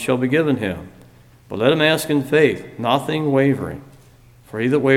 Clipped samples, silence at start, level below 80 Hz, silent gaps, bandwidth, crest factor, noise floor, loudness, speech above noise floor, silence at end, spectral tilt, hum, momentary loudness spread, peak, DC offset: under 0.1%; 0 s; -52 dBFS; none; 16.5 kHz; 18 dB; -48 dBFS; -18 LUFS; 30 dB; 0 s; -6 dB/octave; none; 15 LU; -2 dBFS; under 0.1%